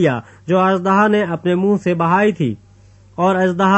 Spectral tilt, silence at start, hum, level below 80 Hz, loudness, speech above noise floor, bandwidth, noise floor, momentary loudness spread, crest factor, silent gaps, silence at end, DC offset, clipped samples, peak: -7.5 dB/octave; 0 s; none; -56 dBFS; -16 LUFS; 31 dB; 8.4 kHz; -46 dBFS; 9 LU; 14 dB; none; 0 s; under 0.1%; under 0.1%; -2 dBFS